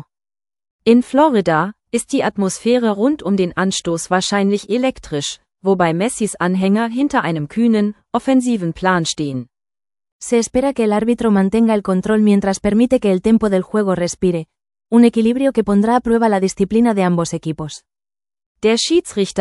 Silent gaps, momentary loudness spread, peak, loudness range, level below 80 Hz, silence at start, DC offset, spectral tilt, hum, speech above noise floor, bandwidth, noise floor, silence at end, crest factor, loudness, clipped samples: 10.12-10.20 s, 18.46-18.55 s; 8 LU; 0 dBFS; 3 LU; -46 dBFS; 0.85 s; under 0.1%; -5.5 dB/octave; none; over 74 dB; 12 kHz; under -90 dBFS; 0 s; 16 dB; -16 LUFS; under 0.1%